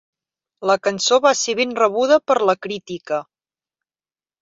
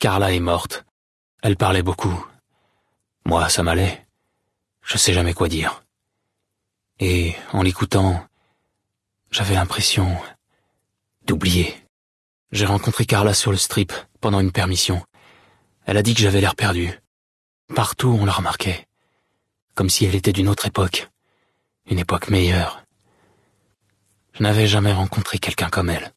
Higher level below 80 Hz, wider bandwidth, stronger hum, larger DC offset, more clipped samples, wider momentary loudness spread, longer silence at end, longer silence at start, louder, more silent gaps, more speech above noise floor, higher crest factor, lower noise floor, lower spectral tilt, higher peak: second, -68 dBFS vs -46 dBFS; second, 7.8 kHz vs 12 kHz; neither; neither; neither; about the same, 11 LU vs 11 LU; first, 1.2 s vs 0.05 s; first, 0.6 s vs 0 s; about the same, -18 LUFS vs -20 LUFS; second, none vs 0.91-1.38 s, 11.89-12.46 s, 17.07-17.68 s, 19.62-19.68 s; first, over 72 dB vs 59 dB; about the same, 18 dB vs 18 dB; first, under -90 dBFS vs -78 dBFS; second, -2.5 dB/octave vs -4.5 dB/octave; about the same, -2 dBFS vs -4 dBFS